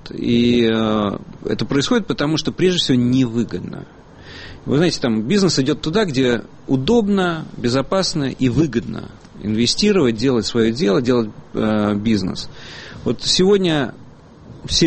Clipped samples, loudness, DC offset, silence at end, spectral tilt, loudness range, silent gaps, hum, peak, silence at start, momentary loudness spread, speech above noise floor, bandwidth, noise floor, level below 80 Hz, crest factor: under 0.1%; -18 LUFS; under 0.1%; 0 s; -5 dB/octave; 2 LU; none; none; -4 dBFS; 0.05 s; 14 LU; 23 dB; 8.8 kHz; -41 dBFS; -42 dBFS; 14 dB